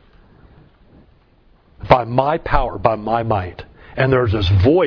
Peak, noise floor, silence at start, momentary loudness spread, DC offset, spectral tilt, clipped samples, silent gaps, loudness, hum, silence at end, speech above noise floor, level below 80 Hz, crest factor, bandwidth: 0 dBFS; -53 dBFS; 1.8 s; 17 LU; under 0.1%; -8.5 dB/octave; under 0.1%; none; -17 LUFS; none; 0 s; 37 dB; -32 dBFS; 18 dB; 5.4 kHz